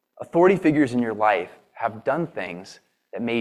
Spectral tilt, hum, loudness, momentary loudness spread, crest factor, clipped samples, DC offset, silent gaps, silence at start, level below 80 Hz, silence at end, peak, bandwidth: -7 dB/octave; none; -22 LUFS; 17 LU; 18 dB; under 0.1%; under 0.1%; none; 0.2 s; -64 dBFS; 0 s; -6 dBFS; 11.5 kHz